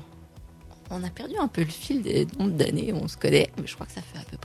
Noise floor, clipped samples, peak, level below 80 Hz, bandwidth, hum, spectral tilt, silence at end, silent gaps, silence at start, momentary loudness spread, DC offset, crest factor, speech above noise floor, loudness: -47 dBFS; under 0.1%; -6 dBFS; -50 dBFS; 14 kHz; none; -6 dB/octave; 0 s; none; 0 s; 16 LU; under 0.1%; 22 dB; 21 dB; -27 LUFS